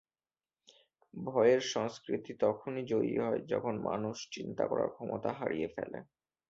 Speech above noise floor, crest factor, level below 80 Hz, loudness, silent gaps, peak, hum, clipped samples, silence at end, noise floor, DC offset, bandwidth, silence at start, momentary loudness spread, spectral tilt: over 56 dB; 20 dB; -72 dBFS; -34 LUFS; none; -14 dBFS; none; under 0.1%; 0.45 s; under -90 dBFS; under 0.1%; 7.8 kHz; 1.15 s; 13 LU; -5.5 dB/octave